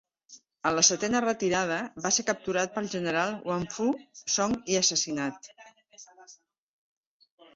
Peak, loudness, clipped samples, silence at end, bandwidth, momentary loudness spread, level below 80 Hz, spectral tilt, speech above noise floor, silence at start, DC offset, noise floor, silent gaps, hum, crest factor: -8 dBFS; -27 LUFS; under 0.1%; 1.2 s; 8 kHz; 10 LU; -64 dBFS; -2.5 dB/octave; 29 dB; 0.3 s; under 0.1%; -57 dBFS; none; none; 22 dB